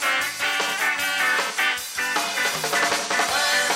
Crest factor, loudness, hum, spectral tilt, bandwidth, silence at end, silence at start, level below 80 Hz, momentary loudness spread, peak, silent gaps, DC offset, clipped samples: 14 dB; -21 LUFS; none; 0 dB/octave; 16.5 kHz; 0 s; 0 s; -64 dBFS; 3 LU; -10 dBFS; none; under 0.1%; under 0.1%